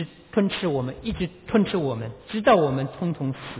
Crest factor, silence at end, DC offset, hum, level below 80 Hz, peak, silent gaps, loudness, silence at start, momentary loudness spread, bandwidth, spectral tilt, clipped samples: 18 dB; 0 s; under 0.1%; none; -48 dBFS; -6 dBFS; none; -24 LUFS; 0 s; 11 LU; 4 kHz; -11 dB/octave; under 0.1%